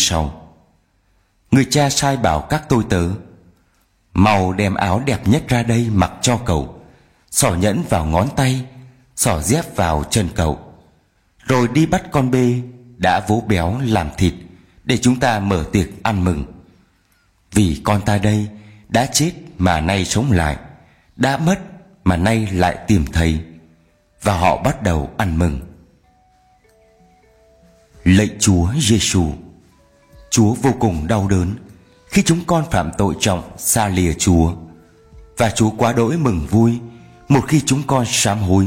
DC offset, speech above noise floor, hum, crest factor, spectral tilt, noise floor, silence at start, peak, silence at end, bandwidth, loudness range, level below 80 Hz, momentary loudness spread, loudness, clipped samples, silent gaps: under 0.1%; 44 dB; none; 18 dB; -5 dB/octave; -60 dBFS; 0 s; 0 dBFS; 0 s; 16.5 kHz; 3 LU; -34 dBFS; 8 LU; -17 LUFS; under 0.1%; none